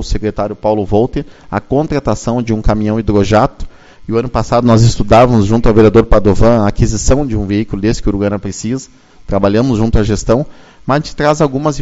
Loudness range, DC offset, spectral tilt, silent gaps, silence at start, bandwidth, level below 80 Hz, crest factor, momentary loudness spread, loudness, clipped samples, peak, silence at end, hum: 5 LU; under 0.1%; -6.5 dB/octave; none; 0 s; 8 kHz; -22 dBFS; 12 dB; 11 LU; -13 LUFS; 0.3%; 0 dBFS; 0 s; none